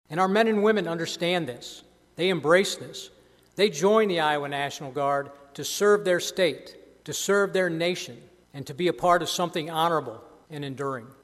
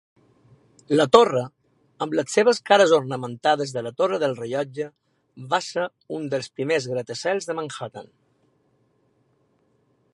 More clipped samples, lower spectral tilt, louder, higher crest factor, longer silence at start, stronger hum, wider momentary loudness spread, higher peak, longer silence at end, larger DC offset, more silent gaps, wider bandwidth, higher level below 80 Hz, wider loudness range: neither; about the same, -4 dB/octave vs -4.5 dB/octave; second, -25 LUFS vs -22 LUFS; about the same, 20 dB vs 24 dB; second, 0.1 s vs 0.9 s; neither; first, 19 LU vs 16 LU; second, -6 dBFS vs 0 dBFS; second, 0.15 s vs 2.1 s; neither; neither; first, 14.5 kHz vs 11.5 kHz; about the same, -66 dBFS vs -70 dBFS; second, 2 LU vs 9 LU